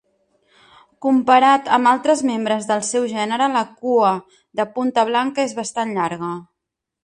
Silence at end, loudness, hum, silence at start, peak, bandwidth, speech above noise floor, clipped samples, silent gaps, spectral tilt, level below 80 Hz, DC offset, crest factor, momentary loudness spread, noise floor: 0.6 s; -18 LUFS; none; 1 s; -2 dBFS; 11.5 kHz; 64 dB; under 0.1%; none; -4 dB/octave; -66 dBFS; under 0.1%; 18 dB; 11 LU; -82 dBFS